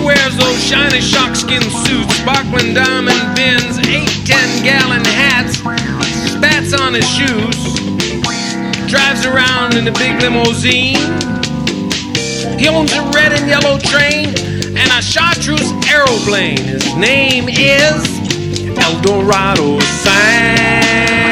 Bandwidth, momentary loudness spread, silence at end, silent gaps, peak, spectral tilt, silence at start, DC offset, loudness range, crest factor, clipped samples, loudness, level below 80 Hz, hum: 17 kHz; 7 LU; 0 s; none; 0 dBFS; -3.5 dB/octave; 0 s; under 0.1%; 2 LU; 12 dB; 0.1%; -11 LUFS; -34 dBFS; none